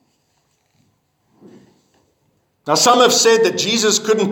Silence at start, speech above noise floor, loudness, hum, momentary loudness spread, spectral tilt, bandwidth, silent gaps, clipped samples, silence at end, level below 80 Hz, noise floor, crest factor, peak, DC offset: 2.65 s; 50 dB; -13 LUFS; none; 6 LU; -2 dB/octave; 18.5 kHz; none; under 0.1%; 0 s; -70 dBFS; -64 dBFS; 18 dB; 0 dBFS; under 0.1%